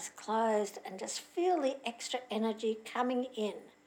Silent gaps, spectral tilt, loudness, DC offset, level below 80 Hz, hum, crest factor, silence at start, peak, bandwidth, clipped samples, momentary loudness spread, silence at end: none; -3.5 dB/octave; -35 LUFS; under 0.1%; -86 dBFS; none; 16 dB; 0 s; -20 dBFS; 18 kHz; under 0.1%; 8 LU; 0.15 s